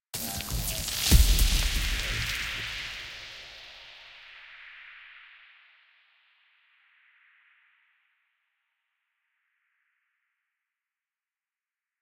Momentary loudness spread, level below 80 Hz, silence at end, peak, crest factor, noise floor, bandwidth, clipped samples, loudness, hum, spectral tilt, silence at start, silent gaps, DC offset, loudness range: 24 LU; -34 dBFS; 6.8 s; -6 dBFS; 26 dB; under -90 dBFS; 17 kHz; under 0.1%; -28 LUFS; none; -2.5 dB/octave; 0.15 s; none; under 0.1%; 24 LU